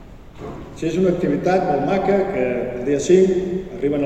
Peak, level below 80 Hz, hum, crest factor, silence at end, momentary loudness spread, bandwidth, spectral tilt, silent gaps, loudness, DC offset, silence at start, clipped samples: -2 dBFS; -42 dBFS; none; 18 dB; 0 s; 16 LU; 8.8 kHz; -6.5 dB/octave; none; -19 LUFS; under 0.1%; 0 s; under 0.1%